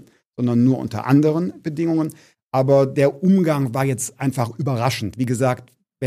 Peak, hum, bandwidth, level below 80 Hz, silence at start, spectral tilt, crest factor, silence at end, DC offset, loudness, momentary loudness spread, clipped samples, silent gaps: -4 dBFS; none; 15.5 kHz; -58 dBFS; 0.4 s; -7 dB/octave; 16 dB; 0 s; under 0.1%; -20 LUFS; 8 LU; under 0.1%; 2.44-2.51 s